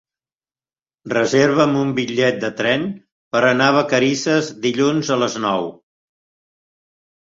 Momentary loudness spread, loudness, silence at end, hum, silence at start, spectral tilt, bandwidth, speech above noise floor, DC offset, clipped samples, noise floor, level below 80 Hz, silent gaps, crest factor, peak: 8 LU; -18 LUFS; 1.5 s; none; 1.05 s; -4.5 dB/octave; 7.8 kHz; over 73 dB; under 0.1%; under 0.1%; under -90 dBFS; -60 dBFS; 3.12-3.31 s; 18 dB; -2 dBFS